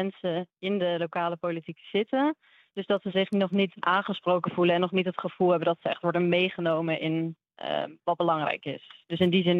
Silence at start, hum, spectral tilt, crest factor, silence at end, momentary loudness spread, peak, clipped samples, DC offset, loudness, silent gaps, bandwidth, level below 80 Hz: 0 s; none; -8.5 dB/octave; 18 dB; 0 s; 9 LU; -10 dBFS; under 0.1%; under 0.1%; -27 LUFS; none; 5.2 kHz; -76 dBFS